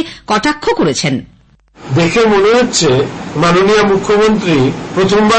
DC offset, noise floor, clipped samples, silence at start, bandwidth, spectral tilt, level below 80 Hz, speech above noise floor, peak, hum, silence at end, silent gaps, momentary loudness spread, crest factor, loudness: under 0.1%; -44 dBFS; under 0.1%; 0 s; 8.8 kHz; -4.5 dB/octave; -38 dBFS; 33 dB; -2 dBFS; none; 0 s; none; 6 LU; 8 dB; -11 LUFS